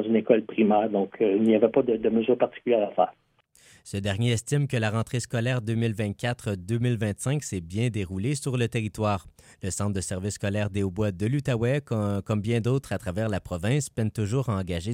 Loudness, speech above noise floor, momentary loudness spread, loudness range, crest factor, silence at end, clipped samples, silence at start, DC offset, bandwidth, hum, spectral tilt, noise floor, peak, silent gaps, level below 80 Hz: -26 LUFS; 33 dB; 7 LU; 5 LU; 20 dB; 0 s; under 0.1%; 0 s; under 0.1%; 16 kHz; none; -6.5 dB/octave; -58 dBFS; -6 dBFS; none; -54 dBFS